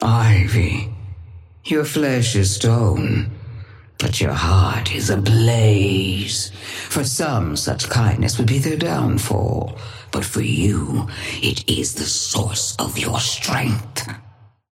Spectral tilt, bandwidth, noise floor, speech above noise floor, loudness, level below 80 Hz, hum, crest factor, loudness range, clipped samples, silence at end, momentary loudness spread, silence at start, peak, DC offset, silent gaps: -4.5 dB/octave; 16 kHz; -39 dBFS; 20 dB; -19 LUFS; -38 dBFS; none; 16 dB; 3 LU; under 0.1%; 0.4 s; 13 LU; 0 s; -4 dBFS; under 0.1%; none